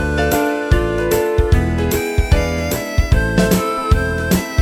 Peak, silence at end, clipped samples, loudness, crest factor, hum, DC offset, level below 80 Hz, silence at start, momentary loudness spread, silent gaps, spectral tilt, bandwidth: 0 dBFS; 0 s; under 0.1%; -17 LUFS; 16 dB; none; under 0.1%; -20 dBFS; 0 s; 3 LU; none; -5.5 dB/octave; 18 kHz